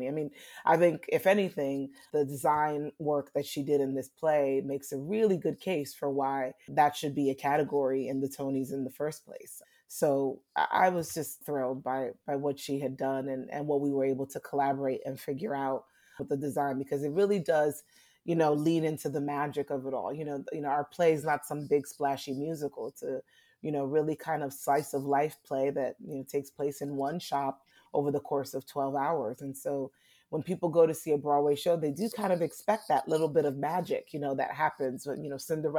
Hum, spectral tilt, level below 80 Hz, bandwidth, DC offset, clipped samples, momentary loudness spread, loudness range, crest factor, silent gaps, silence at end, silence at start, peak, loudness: none; -6 dB/octave; -74 dBFS; 19 kHz; under 0.1%; under 0.1%; 10 LU; 4 LU; 20 dB; none; 0 s; 0 s; -12 dBFS; -31 LUFS